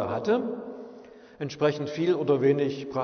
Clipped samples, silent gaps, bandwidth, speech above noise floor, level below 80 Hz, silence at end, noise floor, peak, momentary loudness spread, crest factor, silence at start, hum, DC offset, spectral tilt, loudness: under 0.1%; none; 6.6 kHz; 23 dB; -68 dBFS; 0 s; -48 dBFS; -10 dBFS; 16 LU; 16 dB; 0 s; none; under 0.1%; -7 dB/octave; -26 LUFS